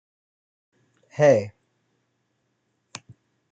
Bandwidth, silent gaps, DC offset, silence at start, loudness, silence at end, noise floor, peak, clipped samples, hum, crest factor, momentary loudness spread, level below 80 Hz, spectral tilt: 8.8 kHz; none; under 0.1%; 1.2 s; -20 LUFS; 2.05 s; -73 dBFS; -6 dBFS; under 0.1%; none; 22 dB; 24 LU; -74 dBFS; -6 dB/octave